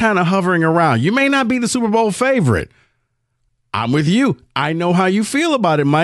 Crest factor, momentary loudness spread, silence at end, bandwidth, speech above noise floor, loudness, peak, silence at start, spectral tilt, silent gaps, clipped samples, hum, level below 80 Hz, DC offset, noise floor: 14 dB; 6 LU; 0 s; 12.5 kHz; 53 dB; -16 LUFS; -2 dBFS; 0 s; -5.5 dB/octave; none; under 0.1%; none; -48 dBFS; under 0.1%; -68 dBFS